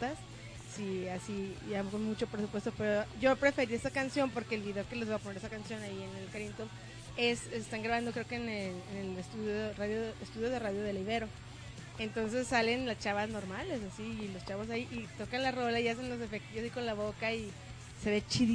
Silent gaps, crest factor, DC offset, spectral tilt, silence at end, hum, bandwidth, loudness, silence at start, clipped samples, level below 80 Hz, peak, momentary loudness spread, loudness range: none; 22 dB; under 0.1%; -5 dB/octave; 0 s; none; 10.5 kHz; -36 LUFS; 0 s; under 0.1%; -58 dBFS; -14 dBFS; 11 LU; 4 LU